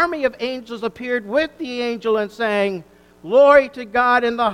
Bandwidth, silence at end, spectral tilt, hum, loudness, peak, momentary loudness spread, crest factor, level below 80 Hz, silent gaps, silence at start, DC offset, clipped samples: 10.5 kHz; 0 s; -5 dB/octave; none; -18 LUFS; 0 dBFS; 14 LU; 18 dB; -54 dBFS; none; 0 s; under 0.1%; under 0.1%